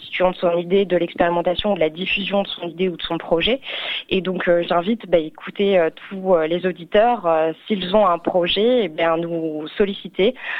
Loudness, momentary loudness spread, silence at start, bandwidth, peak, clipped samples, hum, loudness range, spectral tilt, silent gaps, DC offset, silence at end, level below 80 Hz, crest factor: -20 LUFS; 7 LU; 0 s; 5.6 kHz; -2 dBFS; under 0.1%; none; 2 LU; -7.5 dB/octave; none; under 0.1%; 0 s; -48 dBFS; 16 dB